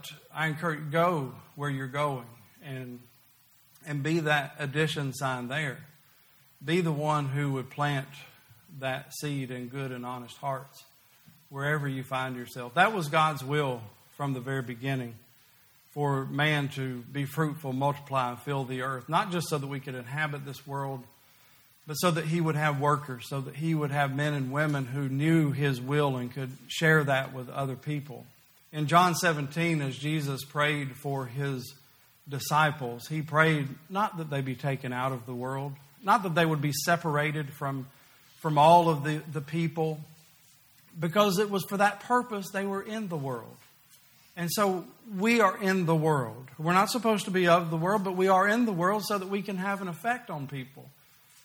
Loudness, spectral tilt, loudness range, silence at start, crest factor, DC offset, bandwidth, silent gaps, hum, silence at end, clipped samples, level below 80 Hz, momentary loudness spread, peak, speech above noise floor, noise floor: -29 LUFS; -5.5 dB/octave; 7 LU; 0.05 s; 22 dB; under 0.1%; over 20 kHz; none; none; 0.55 s; under 0.1%; -70 dBFS; 14 LU; -6 dBFS; 33 dB; -61 dBFS